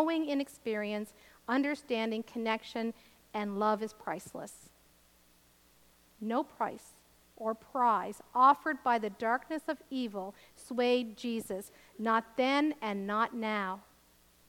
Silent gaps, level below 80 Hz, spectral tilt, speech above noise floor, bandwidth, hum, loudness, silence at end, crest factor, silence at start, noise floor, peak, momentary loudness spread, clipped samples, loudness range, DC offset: none; -74 dBFS; -5 dB/octave; 32 dB; 19 kHz; 60 Hz at -70 dBFS; -33 LUFS; 0.7 s; 20 dB; 0 s; -65 dBFS; -12 dBFS; 14 LU; under 0.1%; 8 LU; under 0.1%